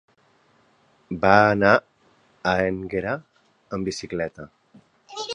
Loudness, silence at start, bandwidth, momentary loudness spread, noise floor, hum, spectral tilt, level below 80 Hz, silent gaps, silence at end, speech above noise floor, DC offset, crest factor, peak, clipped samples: -22 LUFS; 1.1 s; 10.5 kHz; 18 LU; -61 dBFS; none; -5.5 dB/octave; -52 dBFS; none; 0 s; 40 dB; under 0.1%; 24 dB; 0 dBFS; under 0.1%